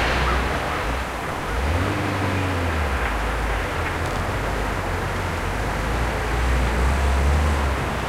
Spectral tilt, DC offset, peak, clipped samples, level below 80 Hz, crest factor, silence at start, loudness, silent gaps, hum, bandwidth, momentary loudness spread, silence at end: -5.5 dB/octave; under 0.1%; -8 dBFS; under 0.1%; -26 dBFS; 14 dB; 0 s; -23 LUFS; none; none; 15.5 kHz; 4 LU; 0 s